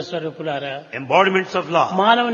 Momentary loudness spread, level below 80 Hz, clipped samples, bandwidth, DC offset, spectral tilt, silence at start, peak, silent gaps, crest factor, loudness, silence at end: 12 LU; -68 dBFS; under 0.1%; 7.4 kHz; under 0.1%; -5 dB/octave; 0 s; 0 dBFS; none; 18 dB; -19 LUFS; 0 s